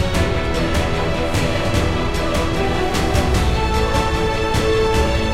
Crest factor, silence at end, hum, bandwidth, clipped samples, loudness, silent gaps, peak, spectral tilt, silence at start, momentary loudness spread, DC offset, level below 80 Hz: 14 dB; 0 s; none; 16 kHz; under 0.1%; -19 LUFS; none; -2 dBFS; -5.5 dB/octave; 0 s; 3 LU; under 0.1%; -24 dBFS